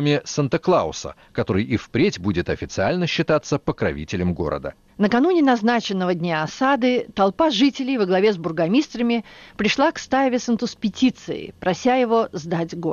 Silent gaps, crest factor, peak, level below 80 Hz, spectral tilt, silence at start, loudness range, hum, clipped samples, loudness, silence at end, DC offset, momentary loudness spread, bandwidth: none; 12 dB; -8 dBFS; -48 dBFS; -5.5 dB/octave; 0 s; 3 LU; none; under 0.1%; -21 LUFS; 0 s; under 0.1%; 8 LU; 7.2 kHz